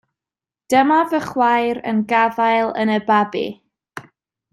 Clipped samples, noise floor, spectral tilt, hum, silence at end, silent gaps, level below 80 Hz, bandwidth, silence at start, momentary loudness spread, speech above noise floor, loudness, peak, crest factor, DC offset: under 0.1%; -90 dBFS; -5.5 dB/octave; none; 0.5 s; none; -62 dBFS; 13.5 kHz; 0.7 s; 18 LU; 73 dB; -17 LUFS; -2 dBFS; 16 dB; under 0.1%